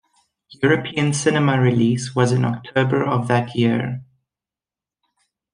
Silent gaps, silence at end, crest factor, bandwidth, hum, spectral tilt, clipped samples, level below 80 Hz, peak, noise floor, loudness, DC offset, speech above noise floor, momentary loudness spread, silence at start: none; 1.5 s; 18 dB; 10.5 kHz; none; -6 dB/octave; under 0.1%; -60 dBFS; -2 dBFS; under -90 dBFS; -19 LUFS; under 0.1%; over 72 dB; 5 LU; 0.5 s